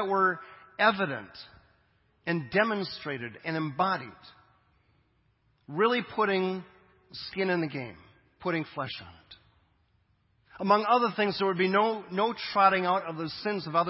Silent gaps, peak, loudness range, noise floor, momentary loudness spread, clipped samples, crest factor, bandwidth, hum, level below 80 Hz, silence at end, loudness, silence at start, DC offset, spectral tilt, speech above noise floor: none; -8 dBFS; 9 LU; -69 dBFS; 15 LU; under 0.1%; 22 dB; 5.8 kHz; none; -68 dBFS; 0 s; -28 LUFS; 0 s; under 0.1%; -9 dB/octave; 41 dB